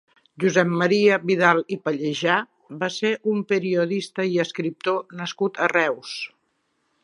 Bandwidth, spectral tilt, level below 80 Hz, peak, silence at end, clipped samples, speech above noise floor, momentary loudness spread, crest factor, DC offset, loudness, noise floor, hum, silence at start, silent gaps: 11 kHz; -5 dB/octave; -74 dBFS; -2 dBFS; 0.75 s; under 0.1%; 49 dB; 11 LU; 20 dB; under 0.1%; -22 LUFS; -71 dBFS; none; 0.4 s; none